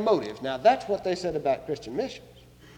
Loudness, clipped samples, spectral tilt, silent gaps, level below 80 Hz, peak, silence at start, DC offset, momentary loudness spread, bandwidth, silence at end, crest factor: -27 LUFS; under 0.1%; -5.5 dB/octave; none; -58 dBFS; -8 dBFS; 0 s; under 0.1%; 10 LU; 11 kHz; 0.1 s; 20 dB